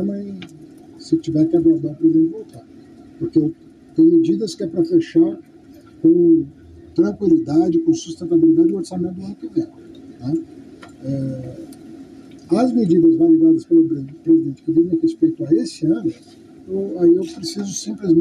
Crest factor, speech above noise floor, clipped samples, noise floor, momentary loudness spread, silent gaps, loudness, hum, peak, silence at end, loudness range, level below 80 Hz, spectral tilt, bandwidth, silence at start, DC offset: 12 dB; 27 dB; under 0.1%; -44 dBFS; 16 LU; none; -18 LUFS; none; -6 dBFS; 0 s; 6 LU; -56 dBFS; -7.5 dB/octave; 9.8 kHz; 0 s; under 0.1%